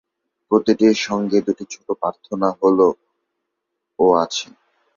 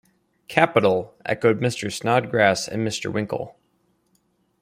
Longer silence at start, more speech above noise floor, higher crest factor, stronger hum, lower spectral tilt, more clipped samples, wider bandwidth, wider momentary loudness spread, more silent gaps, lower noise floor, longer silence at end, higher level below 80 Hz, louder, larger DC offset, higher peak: about the same, 0.5 s vs 0.5 s; first, 61 dB vs 45 dB; about the same, 18 dB vs 22 dB; neither; about the same, -5 dB/octave vs -5 dB/octave; neither; second, 7.4 kHz vs 16 kHz; about the same, 12 LU vs 10 LU; neither; first, -78 dBFS vs -67 dBFS; second, 0.5 s vs 1.1 s; about the same, -62 dBFS vs -62 dBFS; first, -19 LUFS vs -22 LUFS; neither; about the same, -2 dBFS vs -2 dBFS